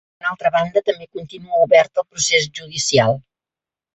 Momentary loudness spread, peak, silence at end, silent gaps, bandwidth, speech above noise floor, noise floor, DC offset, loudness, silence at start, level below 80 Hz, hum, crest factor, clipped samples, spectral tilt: 13 LU; -2 dBFS; 0.75 s; none; 8.2 kHz; 71 dB; -89 dBFS; under 0.1%; -18 LUFS; 0.25 s; -58 dBFS; none; 18 dB; under 0.1%; -3 dB/octave